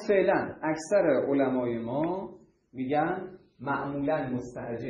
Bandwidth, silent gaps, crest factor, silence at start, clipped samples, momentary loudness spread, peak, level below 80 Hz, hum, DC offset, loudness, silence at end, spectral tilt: 11 kHz; none; 18 dB; 0 s; under 0.1%; 13 LU; -12 dBFS; -62 dBFS; none; under 0.1%; -29 LUFS; 0 s; -6.5 dB/octave